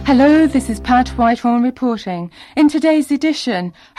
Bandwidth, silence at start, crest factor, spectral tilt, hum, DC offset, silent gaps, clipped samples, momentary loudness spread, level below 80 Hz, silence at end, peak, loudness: 13 kHz; 0 s; 10 dB; -5.5 dB/octave; none; under 0.1%; none; under 0.1%; 12 LU; -36 dBFS; 0.3 s; -4 dBFS; -15 LUFS